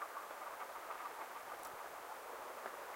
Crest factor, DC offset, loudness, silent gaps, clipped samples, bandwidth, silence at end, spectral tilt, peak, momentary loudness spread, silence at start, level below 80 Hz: 20 dB; under 0.1%; -48 LUFS; none; under 0.1%; 16 kHz; 0 s; -1 dB/octave; -30 dBFS; 2 LU; 0 s; -84 dBFS